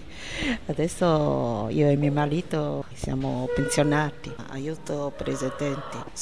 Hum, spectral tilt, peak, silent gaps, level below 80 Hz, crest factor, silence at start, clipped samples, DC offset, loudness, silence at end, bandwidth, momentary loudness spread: none; -6 dB/octave; -10 dBFS; none; -44 dBFS; 16 dB; 0 s; under 0.1%; 0.8%; -26 LUFS; 0 s; 11 kHz; 11 LU